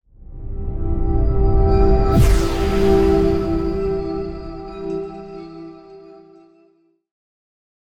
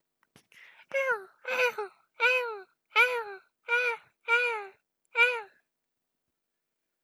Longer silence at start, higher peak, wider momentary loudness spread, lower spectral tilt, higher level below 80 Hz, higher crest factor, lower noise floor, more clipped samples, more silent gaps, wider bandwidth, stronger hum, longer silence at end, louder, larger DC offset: second, 0.2 s vs 0.9 s; first, -4 dBFS vs -10 dBFS; about the same, 19 LU vs 17 LU; first, -7.5 dB/octave vs 0.5 dB/octave; first, -22 dBFS vs under -90 dBFS; second, 16 dB vs 22 dB; second, -58 dBFS vs -84 dBFS; neither; neither; about the same, 15.5 kHz vs 15.5 kHz; neither; first, 1.8 s vs 1.55 s; first, -19 LUFS vs -28 LUFS; neither